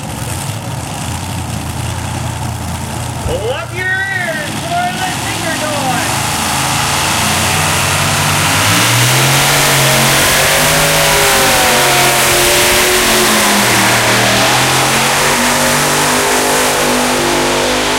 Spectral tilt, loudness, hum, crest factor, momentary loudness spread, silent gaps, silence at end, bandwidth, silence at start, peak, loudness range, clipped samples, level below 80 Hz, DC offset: -2.5 dB/octave; -11 LUFS; none; 12 dB; 12 LU; none; 0 s; 16 kHz; 0 s; 0 dBFS; 9 LU; under 0.1%; -34 dBFS; under 0.1%